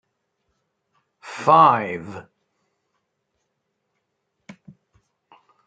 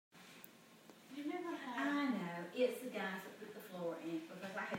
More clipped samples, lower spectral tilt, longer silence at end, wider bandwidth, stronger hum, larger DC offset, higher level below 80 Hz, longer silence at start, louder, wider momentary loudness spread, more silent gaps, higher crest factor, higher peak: neither; about the same, -6 dB/octave vs -5 dB/octave; first, 3.45 s vs 0 s; second, 9 kHz vs 16 kHz; neither; neither; first, -72 dBFS vs under -90 dBFS; first, 1.25 s vs 0.15 s; first, -17 LUFS vs -43 LUFS; first, 24 LU vs 20 LU; neither; about the same, 24 dB vs 20 dB; first, -2 dBFS vs -24 dBFS